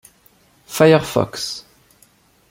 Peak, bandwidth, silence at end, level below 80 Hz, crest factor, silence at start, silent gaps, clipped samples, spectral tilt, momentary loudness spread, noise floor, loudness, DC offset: -2 dBFS; 16.5 kHz; 0.9 s; -54 dBFS; 18 dB; 0.7 s; none; under 0.1%; -5 dB/octave; 17 LU; -55 dBFS; -17 LUFS; under 0.1%